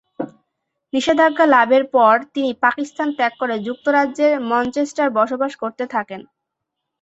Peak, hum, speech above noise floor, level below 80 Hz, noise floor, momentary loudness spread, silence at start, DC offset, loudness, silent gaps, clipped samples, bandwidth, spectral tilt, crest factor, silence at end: -2 dBFS; none; 62 dB; -62 dBFS; -79 dBFS; 12 LU; 0.2 s; under 0.1%; -18 LUFS; none; under 0.1%; 8.2 kHz; -4 dB/octave; 16 dB; 0.8 s